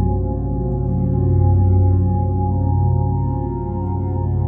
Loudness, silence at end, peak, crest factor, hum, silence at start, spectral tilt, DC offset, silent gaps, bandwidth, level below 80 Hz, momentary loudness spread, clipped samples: -19 LUFS; 0 s; -6 dBFS; 12 dB; none; 0 s; -15 dB/octave; under 0.1%; none; 1.8 kHz; -26 dBFS; 7 LU; under 0.1%